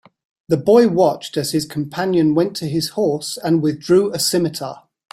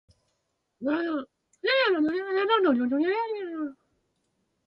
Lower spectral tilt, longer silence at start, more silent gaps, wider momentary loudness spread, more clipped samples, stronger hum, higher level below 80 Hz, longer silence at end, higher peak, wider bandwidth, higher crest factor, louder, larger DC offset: about the same, -5.5 dB/octave vs -5.5 dB/octave; second, 0.5 s vs 0.8 s; neither; about the same, 10 LU vs 12 LU; neither; neither; first, -58 dBFS vs -72 dBFS; second, 0.35 s vs 0.95 s; first, -2 dBFS vs -12 dBFS; first, 16 kHz vs 7 kHz; about the same, 16 dB vs 16 dB; first, -18 LUFS vs -26 LUFS; neither